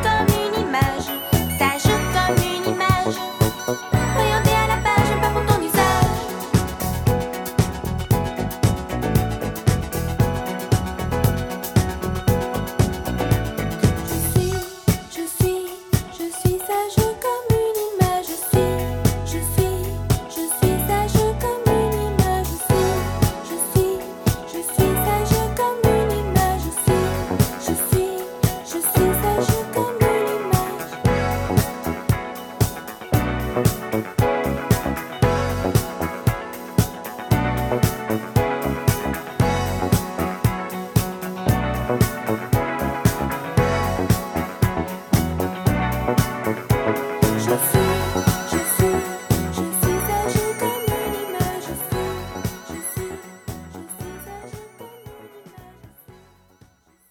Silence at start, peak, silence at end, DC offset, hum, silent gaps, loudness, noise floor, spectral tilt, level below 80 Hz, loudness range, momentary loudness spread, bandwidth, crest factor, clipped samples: 0 s; -2 dBFS; 1 s; under 0.1%; none; none; -21 LUFS; -54 dBFS; -5.5 dB/octave; -32 dBFS; 3 LU; 7 LU; 19 kHz; 20 dB; under 0.1%